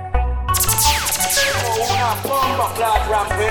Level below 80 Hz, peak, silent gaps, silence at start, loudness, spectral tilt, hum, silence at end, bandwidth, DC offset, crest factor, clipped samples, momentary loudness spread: -26 dBFS; 0 dBFS; none; 0 s; -17 LUFS; -2 dB/octave; none; 0 s; 19.5 kHz; under 0.1%; 18 dB; under 0.1%; 5 LU